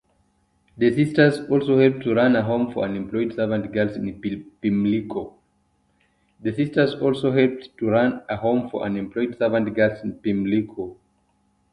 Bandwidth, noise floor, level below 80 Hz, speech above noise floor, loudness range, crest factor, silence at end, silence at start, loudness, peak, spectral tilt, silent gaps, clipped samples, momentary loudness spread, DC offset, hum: 11.5 kHz; -66 dBFS; -56 dBFS; 45 dB; 5 LU; 20 dB; 0.8 s; 0.75 s; -22 LUFS; -2 dBFS; -8 dB/octave; none; under 0.1%; 11 LU; under 0.1%; none